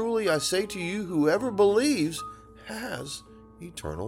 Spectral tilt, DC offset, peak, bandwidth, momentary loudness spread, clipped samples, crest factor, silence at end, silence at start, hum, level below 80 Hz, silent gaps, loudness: -4.5 dB/octave; under 0.1%; -12 dBFS; 16.5 kHz; 18 LU; under 0.1%; 16 dB; 0 s; 0 s; none; -54 dBFS; none; -26 LUFS